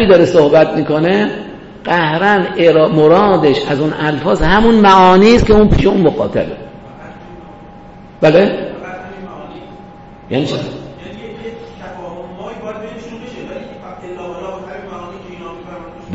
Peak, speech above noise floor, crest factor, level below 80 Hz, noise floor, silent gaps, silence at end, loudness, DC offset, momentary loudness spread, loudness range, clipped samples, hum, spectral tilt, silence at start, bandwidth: 0 dBFS; 26 dB; 14 dB; -30 dBFS; -36 dBFS; none; 0 s; -11 LUFS; under 0.1%; 23 LU; 19 LU; under 0.1%; none; -7 dB/octave; 0 s; 8 kHz